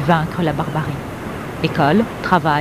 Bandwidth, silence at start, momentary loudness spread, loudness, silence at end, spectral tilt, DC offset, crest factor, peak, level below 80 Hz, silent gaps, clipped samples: 15.5 kHz; 0 s; 12 LU; -19 LUFS; 0 s; -7 dB/octave; 0.3%; 18 dB; 0 dBFS; -40 dBFS; none; under 0.1%